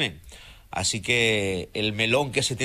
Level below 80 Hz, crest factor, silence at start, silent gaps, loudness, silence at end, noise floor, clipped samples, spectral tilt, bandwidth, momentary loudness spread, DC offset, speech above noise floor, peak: -50 dBFS; 18 dB; 0 s; none; -24 LUFS; 0 s; -46 dBFS; under 0.1%; -3 dB/octave; 14.5 kHz; 8 LU; under 0.1%; 22 dB; -6 dBFS